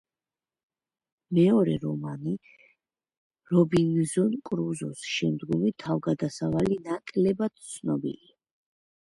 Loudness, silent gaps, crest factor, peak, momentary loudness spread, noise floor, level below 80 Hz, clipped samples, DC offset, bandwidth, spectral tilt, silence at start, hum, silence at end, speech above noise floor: -27 LUFS; 3.17-3.30 s; 18 dB; -10 dBFS; 11 LU; under -90 dBFS; -60 dBFS; under 0.1%; under 0.1%; 11.5 kHz; -6.5 dB/octave; 1.3 s; none; 0.95 s; over 64 dB